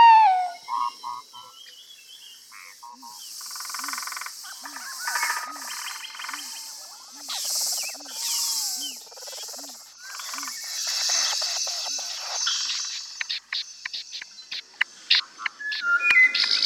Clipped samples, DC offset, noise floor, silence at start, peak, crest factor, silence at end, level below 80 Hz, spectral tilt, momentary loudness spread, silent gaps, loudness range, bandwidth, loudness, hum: under 0.1%; under 0.1%; -47 dBFS; 0 s; -6 dBFS; 22 dB; 0 s; -80 dBFS; 4 dB/octave; 20 LU; none; 10 LU; 18 kHz; -25 LUFS; none